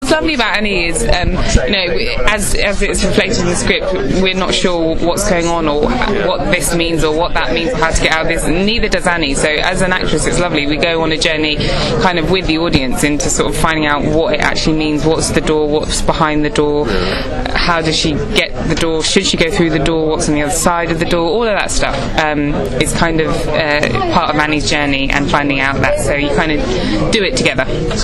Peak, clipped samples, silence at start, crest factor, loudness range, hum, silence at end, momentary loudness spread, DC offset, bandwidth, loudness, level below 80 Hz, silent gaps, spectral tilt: 0 dBFS; under 0.1%; 0 s; 14 dB; 1 LU; none; 0 s; 3 LU; under 0.1%; 12.5 kHz; -14 LUFS; -22 dBFS; none; -4 dB/octave